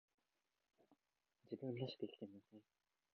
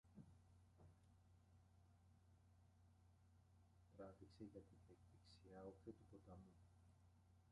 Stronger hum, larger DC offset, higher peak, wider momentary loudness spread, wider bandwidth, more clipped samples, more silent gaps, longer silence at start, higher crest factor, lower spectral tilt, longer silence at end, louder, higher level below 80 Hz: neither; neither; first, -34 dBFS vs -46 dBFS; first, 20 LU vs 7 LU; second, 6.4 kHz vs 10.5 kHz; neither; neither; first, 0.9 s vs 0.05 s; about the same, 22 dB vs 22 dB; about the same, -6 dB/octave vs -7 dB/octave; first, 0.55 s vs 0 s; first, -51 LUFS vs -64 LUFS; second, under -90 dBFS vs -78 dBFS